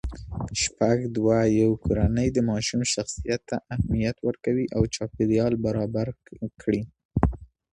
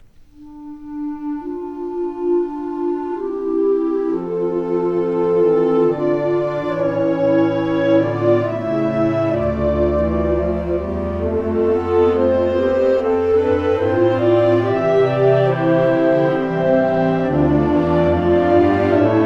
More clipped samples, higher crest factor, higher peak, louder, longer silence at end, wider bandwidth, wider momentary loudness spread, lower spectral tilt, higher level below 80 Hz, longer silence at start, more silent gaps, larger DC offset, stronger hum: neither; first, 22 dB vs 14 dB; about the same, -4 dBFS vs -2 dBFS; second, -25 LUFS vs -17 LUFS; first, 0.3 s vs 0 s; first, 11.5 kHz vs 6.4 kHz; about the same, 9 LU vs 8 LU; second, -5.5 dB/octave vs -9 dB/octave; about the same, -38 dBFS vs -36 dBFS; second, 0.05 s vs 0.4 s; first, 7.05-7.09 s vs none; neither; neither